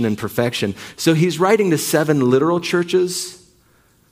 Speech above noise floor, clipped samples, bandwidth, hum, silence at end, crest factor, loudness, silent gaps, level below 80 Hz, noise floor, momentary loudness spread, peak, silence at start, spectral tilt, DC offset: 38 dB; under 0.1%; 16 kHz; none; 0.75 s; 16 dB; -18 LUFS; none; -58 dBFS; -56 dBFS; 8 LU; -2 dBFS; 0 s; -5 dB/octave; under 0.1%